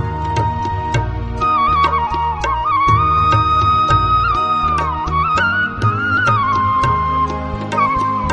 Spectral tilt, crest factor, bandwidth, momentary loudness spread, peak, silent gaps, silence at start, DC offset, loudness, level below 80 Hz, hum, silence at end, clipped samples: -6 dB/octave; 14 dB; 9.8 kHz; 6 LU; 0 dBFS; none; 0 s; under 0.1%; -15 LUFS; -28 dBFS; none; 0 s; under 0.1%